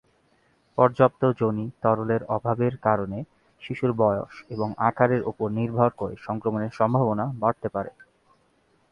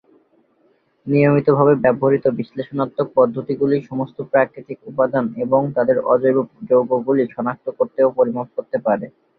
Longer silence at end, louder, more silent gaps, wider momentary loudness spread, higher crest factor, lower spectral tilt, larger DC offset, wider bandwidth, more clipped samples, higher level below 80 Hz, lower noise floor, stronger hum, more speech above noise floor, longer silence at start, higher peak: first, 1 s vs 0.3 s; second, -25 LUFS vs -18 LUFS; neither; about the same, 12 LU vs 10 LU; about the same, 22 dB vs 18 dB; second, -9.5 dB/octave vs -11.5 dB/octave; neither; first, 6.8 kHz vs 4.7 kHz; neither; about the same, -58 dBFS vs -60 dBFS; first, -65 dBFS vs -60 dBFS; neither; about the same, 41 dB vs 42 dB; second, 0.75 s vs 1.05 s; about the same, -2 dBFS vs -2 dBFS